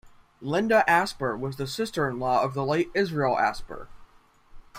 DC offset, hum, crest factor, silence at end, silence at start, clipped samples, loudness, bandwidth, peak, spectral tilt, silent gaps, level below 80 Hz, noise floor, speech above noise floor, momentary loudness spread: under 0.1%; none; 20 dB; 0 s; 0.05 s; under 0.1%; -25 LUFS; 16 kHz; -6 dBFS; -5.5 dB/octave; none; -52 dBFS; -56 dBFS; 31 dB; 13 LU